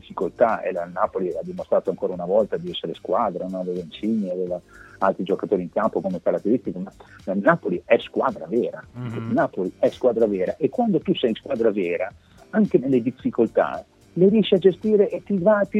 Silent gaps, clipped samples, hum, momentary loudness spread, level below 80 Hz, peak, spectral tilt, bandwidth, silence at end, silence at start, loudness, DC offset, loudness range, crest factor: none; under 0.1%; none; 10 LU; -60 dBFS; -2 dBFS; -8 dB/octave; 8.2 kHz; 0 s; 0.1 s; -23 LUFS; under 0.1%; 4 LU; 20 dB